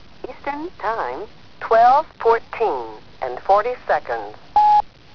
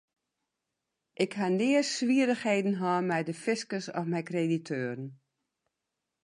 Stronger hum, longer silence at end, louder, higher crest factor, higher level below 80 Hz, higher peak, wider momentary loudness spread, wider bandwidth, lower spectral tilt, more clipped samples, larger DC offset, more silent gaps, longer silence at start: neither; second, 0.15 s vs 1.1 s; first, -19 LUFS vs -30 LUFS; about the same, 16 dB vs 20 dB; first, -50 dBFS vs -82 dBFS; first, -4 dBFS vs -12 dBFS; first, 17 LU vs 8 LU; second, 5.4 kHz vs 11.5 kHz; about the same, -5 dB/octave vs -5.5 dB/octave; neither; first, 0.9% vs under 0.1%; neither; second, 0.25 s vs 1.2 s